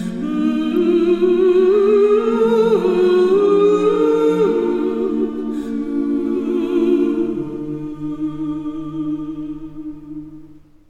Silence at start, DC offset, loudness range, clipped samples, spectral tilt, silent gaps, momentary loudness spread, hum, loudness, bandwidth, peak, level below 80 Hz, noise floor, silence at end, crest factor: 0 s; under 0.1%; 10 LU; under 0.1%; -7.5 dB/octave; none; 14 LU; none; -17 LUFS; 8.8 kHz; -4 dBFS; -48 dBFS; -42 dBFS; 0.3 s; 12 dB